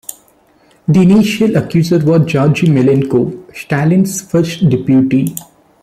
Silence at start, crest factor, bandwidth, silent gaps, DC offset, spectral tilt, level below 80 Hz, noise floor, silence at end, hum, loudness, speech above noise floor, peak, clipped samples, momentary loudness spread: 0.9 s; 10 dB; 15 kHz; none; under 0.1%; -7 dB/octave; -46 dBFS; -50 dBFS; 0.4 s; none; -12 LUFS; 39 dB; -2 dBFS; under 0.1%; 11 LU